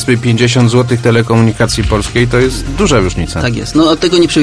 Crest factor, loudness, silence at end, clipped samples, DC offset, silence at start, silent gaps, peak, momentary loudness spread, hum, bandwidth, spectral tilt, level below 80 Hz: 10 dB; -11 LUFS; 0 s; under 0.1%; under 0.1%; 0 s; none; 0 dBFS; 5 LU; none; 11 kHz; -5.5 dB/octave; -24 dBFS